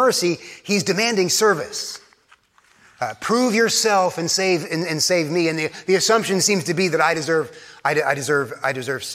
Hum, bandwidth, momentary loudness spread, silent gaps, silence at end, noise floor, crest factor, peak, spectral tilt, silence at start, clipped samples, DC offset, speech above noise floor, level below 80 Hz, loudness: none; 16.5 kHz; 10 LU; none; 0 s; -56 dBFS; 18 dB; -2 dBFS; -3 dB/octave; 0 s; under 0.1%; under 0.1%; 36 dB; -66 dBFS; -19 LUFS